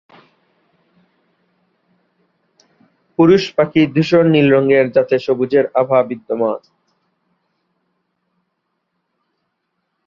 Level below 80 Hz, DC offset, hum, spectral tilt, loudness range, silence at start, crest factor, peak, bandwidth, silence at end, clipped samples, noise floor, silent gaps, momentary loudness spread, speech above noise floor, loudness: -58 dBFS; under 0.1%; none; -7.5 dB/octave; 10 LU; 3.2 s; 16 dB; -2 dBFS; 7.2 kHz; 3.5 s; under 0.1%; -72 dBFS; none; 8 LU; 58 dB; -14 LUFS